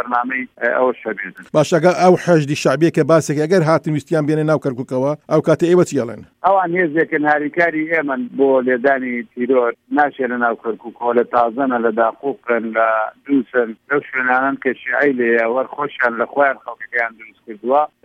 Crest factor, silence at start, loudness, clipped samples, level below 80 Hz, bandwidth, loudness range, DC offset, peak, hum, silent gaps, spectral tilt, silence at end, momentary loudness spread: 16 dB; 0 s; -17 LUFS; under 0.1%; -64 dBFS; 15 kHz; 3 LU; under 0.1%; 0 dBFS; none; none; -6.5 dB/octave; 0.15 s; 8 LU